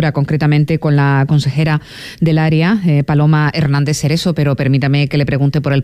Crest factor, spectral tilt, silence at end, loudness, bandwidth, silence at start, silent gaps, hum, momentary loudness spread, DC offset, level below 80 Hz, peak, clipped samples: 10 dB; -7 dB/octave; 0 s; -13 LUFS; 11.5 kHz; 0 s; none; none; 3 LU; under 0.1%; -40 dBFS; -4 dBFS; under 0.1%